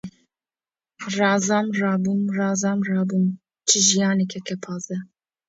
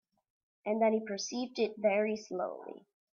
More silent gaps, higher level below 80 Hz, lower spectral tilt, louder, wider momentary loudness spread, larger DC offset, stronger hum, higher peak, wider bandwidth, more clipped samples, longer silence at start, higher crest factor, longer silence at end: neither; first, -68 dBFS vs -82 dBFS; about the same, -3.5 dB/octave vs -4 dB/octave; first, -21 LUFS vs -33 LUFS; about the same, 14 LU vs 13 LU; neither; neither; first, -4 dBFS vs -18 dBFS; about the same, 8 kHz vs 7.4 kHz; neither; second, 0.05 s vs 0.65 s; about the same, 18 dB vs 18 dB; about the same, 0.45 s vs 0.35 s